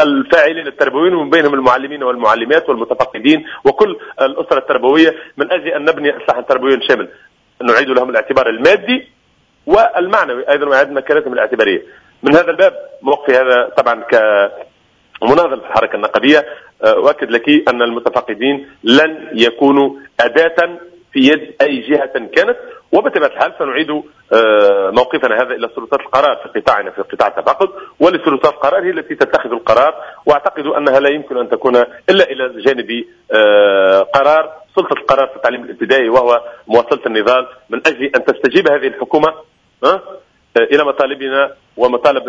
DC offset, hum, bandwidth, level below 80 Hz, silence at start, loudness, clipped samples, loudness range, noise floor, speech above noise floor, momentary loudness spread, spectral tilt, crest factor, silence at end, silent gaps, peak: under 0.1%; none; 8 kHz; -52 dBFS; 0 s; -13 LUFS; 0.3%; 2 LU; -55 dBFS; 42 dB; 7 LU; -5 dB/octave; 12 dB; 0 s; none; 0 dBFS